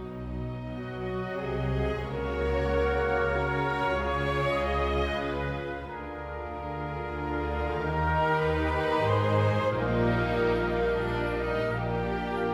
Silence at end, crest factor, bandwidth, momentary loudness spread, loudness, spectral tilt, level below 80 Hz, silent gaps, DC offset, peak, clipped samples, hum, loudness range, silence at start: 0 s; 14 dB; 12.5 kHz; 10 LU; -29 LUFS; -7.5 dB/octave; -38 dBFS; none; under 0.1%; -14 dBFS; under 0.1%; none; 5 LU; 0 s